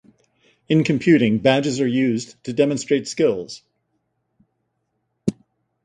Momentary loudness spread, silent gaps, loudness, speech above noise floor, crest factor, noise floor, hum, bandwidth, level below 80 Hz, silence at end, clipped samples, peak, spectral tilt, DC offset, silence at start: 12 LU; none; -20 LUFS; 55 dB; 20 dB; -73 dBFS; none; 11 kHz; -58 dBFS; 0.5 s; under 0.1%; -2 dBFS; -6 dB/octave; under 0.1%; 0.7 s